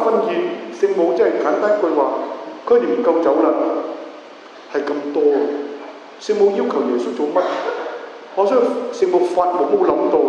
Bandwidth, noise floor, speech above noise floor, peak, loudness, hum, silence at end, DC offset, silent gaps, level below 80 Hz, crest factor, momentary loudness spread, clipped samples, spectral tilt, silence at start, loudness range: 8.8 kHz; -39 dBFS; 22 dB; -2 dBFS; -18 LUFS; none; 0 s; under 0.1%; none; -64 dBFS; 16 dB; 13 LU; under 0.1%; -5.5 dB/octave; 0 s; 3 LU